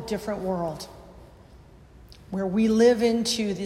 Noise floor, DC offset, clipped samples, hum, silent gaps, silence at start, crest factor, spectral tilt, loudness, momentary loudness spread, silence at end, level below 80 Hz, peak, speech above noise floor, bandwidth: -50 dBFS; under 0.1%; under 0.1%; none; none; 0 s; 18 dB; -5 dB/octave; -24 LUFS; 16 LU; 0 s; -52 dBFS; -8 dBFS; 26 dB; 14.5 kHz